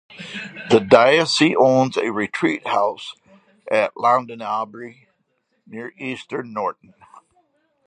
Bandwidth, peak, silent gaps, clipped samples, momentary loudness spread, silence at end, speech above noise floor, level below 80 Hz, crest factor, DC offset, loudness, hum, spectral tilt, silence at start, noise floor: 10 kHz; 0 dBFS; none; under 0.1%; 20 LU; 0.7 s; 50 dB; -64 dBFS; 20 dB; under 0.1%; -19 LUFS; none; -4.5 dB/octave; 0.2 s; -69 dBFS